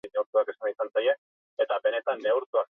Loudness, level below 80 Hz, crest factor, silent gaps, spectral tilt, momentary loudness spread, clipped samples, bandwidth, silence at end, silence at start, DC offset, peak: -28 LUFS; -84 dBFS; 14 dB; 0.26-0.33 s, 1.18-1.57 s, 2.46-2.53 s; -4.5 dB/octave; 5 LU; under 0.1%; 3.9 kHz; 0.05 s; 0.05 s; under 0.1%; -12 dBFS